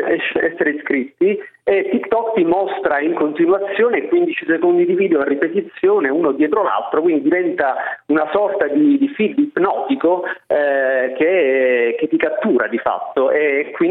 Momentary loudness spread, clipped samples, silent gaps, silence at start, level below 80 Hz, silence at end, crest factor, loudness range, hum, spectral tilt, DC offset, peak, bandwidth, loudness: 4 LU; under 0.1%; none; 0 s; -60 dBFS; 0 s; 16 dB; 1 LU; none; -9 dB/octave; under 0.1%; 0 dBFS; 4 kHz; -17 LUFS